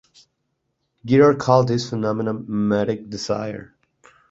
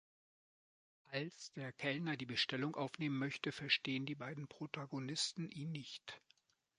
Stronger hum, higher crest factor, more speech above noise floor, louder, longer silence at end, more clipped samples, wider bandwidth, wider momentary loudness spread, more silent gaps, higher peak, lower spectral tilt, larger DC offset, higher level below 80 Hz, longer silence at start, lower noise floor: neither; about the same, 20 dB vs 24 dB; first, 54 dB vs 34 dB; first, -20 LUFS vs -42 LUFS; about the same, 0.65 s vs 0.6 s; neither; second, 8 kHz vs 11 kHz; about the same, 13 LU vs 12 LU; neither; first, -2 dBFS vs -20 dBFS; first, -6.5 dB/octave vs -4 dB/octave; neither; first, -56 dBFS vs -82 dBFS; about the same, 1.05 s vs 1.1 s; about the same, -74 dBFS vs -76 dBFS